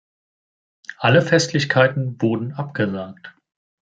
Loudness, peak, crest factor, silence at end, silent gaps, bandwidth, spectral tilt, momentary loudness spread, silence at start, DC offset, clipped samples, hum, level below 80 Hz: -19 LUFS; -2 dBFS; 20 dB; 0.6 s; none; 9.2 kHz; -5.5 dB/octave; 17 LU; 0.9 s; under 0.1%; under 0.1%; none; -62 dBFS